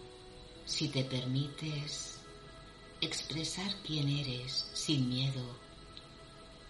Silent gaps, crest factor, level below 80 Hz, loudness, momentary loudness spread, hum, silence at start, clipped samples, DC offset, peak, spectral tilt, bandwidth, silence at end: none; 22 dB; -60 dBFS; -36 LUFS; 19 LU; none; 0 s; under 0.1%; under 0.1%; -16 dBFS; -4.5 dB/octave; 11.5 kHz; 0 s